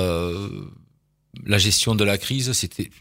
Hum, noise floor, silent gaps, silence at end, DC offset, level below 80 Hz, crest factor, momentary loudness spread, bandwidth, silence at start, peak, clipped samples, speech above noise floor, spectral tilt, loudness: none; -62 dBFS; none; 0.1 s; under 0.1%; -46 dBFS; 22 dB; 16 LU; 16.5 kHz; 0 s; 0 dBFS; under 0.1%; 41 dB; -3.5 dB/octave; -21 LUFS